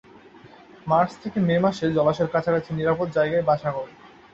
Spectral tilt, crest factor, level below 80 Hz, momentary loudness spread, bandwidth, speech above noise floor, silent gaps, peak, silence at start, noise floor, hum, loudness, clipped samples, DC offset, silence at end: -7.5 dB/octave; 16 dB; -56 dBFS; 7 LU; 7.8 kHz; 26 dB; none; -6 dBFS; 0.45 s; -48 dBFS; none; -23 LUFS; under 0.1%; under 0.1%; 0.25 s